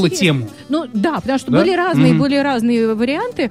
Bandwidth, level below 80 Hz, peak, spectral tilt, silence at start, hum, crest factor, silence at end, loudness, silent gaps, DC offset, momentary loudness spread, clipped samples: 15.5 kHz; -50 dBFS; -2 dBFS; -6 dB/octave; 0 s; none; 14 dB; 0 s; -16 LUFS; none; 0.2%; 8 LU; under 0.1%